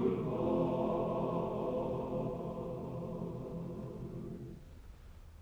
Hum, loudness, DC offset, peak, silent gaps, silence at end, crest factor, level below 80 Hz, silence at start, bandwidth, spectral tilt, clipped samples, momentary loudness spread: none; -38 LUFS; under 0.1%; -22 dBFS; none; 0 s; 16 dB; -56 dBFS; 0 s; over 20 kHz; -9.5 dB/octave; under 0.1%; 20 LU